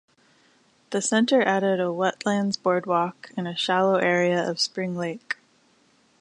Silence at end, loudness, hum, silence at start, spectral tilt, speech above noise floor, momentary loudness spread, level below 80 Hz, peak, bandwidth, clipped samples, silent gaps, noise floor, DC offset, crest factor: 0.9 s; -24 LUFS; none; 0.9 s; -4.5 dB/octave; 38 dB; 10 LU; -74 dBFS; -6 dBFS; 11 kHz; under 0.1%; none; -62 dBFS; under 0.1%; 18 dB